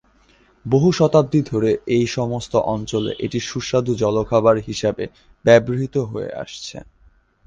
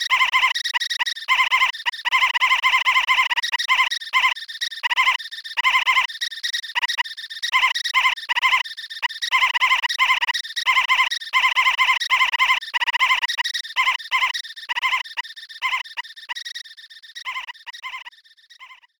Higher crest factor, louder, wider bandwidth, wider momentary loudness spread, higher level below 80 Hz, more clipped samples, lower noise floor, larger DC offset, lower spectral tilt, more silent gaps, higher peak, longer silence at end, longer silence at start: about the same, 18 dB vs 16 dB; about the same, -19 LUFS vs -19 LUFS; second, 9.6 kHz vs 19.5 kHz; about the same, 15 LU vs 14 LU; first, -48 dBFS vs -66 dBFS; neither; first, -55 dBFS vs -51 dBFS; neither; first, -6 dB/octave vs 3.5 dB/octave; neither; first, -2 dBFS vs -6 dBFS; first, 0.65 s vs 0.25 s; first, 0.65 s vs 0 s